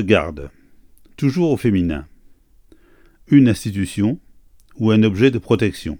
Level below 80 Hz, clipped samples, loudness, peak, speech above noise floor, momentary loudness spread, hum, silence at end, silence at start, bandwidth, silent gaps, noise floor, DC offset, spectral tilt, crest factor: -42 dBFS; under 0.1%; -18 LUFS; 0 dBFS; 34 dB; 16 LU; none; 0.05 s; 0 s; 18 kHz; none; -50 dBFS; under 0.1%; -7 dB/octave; 18 dB